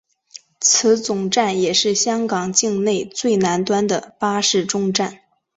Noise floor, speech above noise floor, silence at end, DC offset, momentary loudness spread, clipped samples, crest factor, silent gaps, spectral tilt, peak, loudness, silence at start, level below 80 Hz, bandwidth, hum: -44 dBFS; 26 dB; 0.4 s; under 0.1%; 6 LU; under 0.1%; 18 dB; none; -3 dB/octave; -2 dBFS; -18 LUFS; 0.35 s; -62 dBFS; 8.4 kHz; none